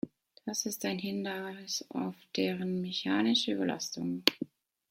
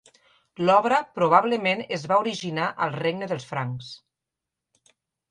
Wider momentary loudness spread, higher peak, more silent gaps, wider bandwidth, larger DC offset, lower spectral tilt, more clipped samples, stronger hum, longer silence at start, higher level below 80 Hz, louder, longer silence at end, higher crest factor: about the same, 11 LU vs 11 LU; about the same, -2 dBFS vs -4 dBFS; neither; first, 16.5 kHz vs 11 kHz; neither; second, -3.5 dB/octave vs -5.5 dB/octave; neither; neither; second, 0.05 s vs 0.6 s; second, -78 dBFS vs -68 dBFS; second, -33 LUFS vs -24 LUFS; second, 0.45 s vs 1.35 s; first, 32 dB vs 22 dB